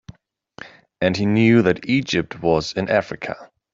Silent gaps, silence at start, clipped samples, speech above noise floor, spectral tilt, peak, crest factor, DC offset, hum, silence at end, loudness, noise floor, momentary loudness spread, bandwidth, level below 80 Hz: none; 0.1 s; under 0.1%; 30 dB; -6.5 dB/octave; -2 dBFS; 18 dB; under 0.1%; none; 0.3 s; -19 LUFS; -49 dBFS; 21 LU; 7.6 kHz; -52 dBFS